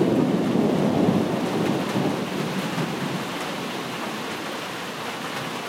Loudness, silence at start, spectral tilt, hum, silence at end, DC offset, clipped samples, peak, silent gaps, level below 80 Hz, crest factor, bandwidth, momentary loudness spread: -25 LUFS; 0 s; -5.5 dB/octave; none; 0 s; under 0.1%; under 0.1%; -8 dBFS; none; -58 dBFS; 16 dB; 16 kHz; 9 LU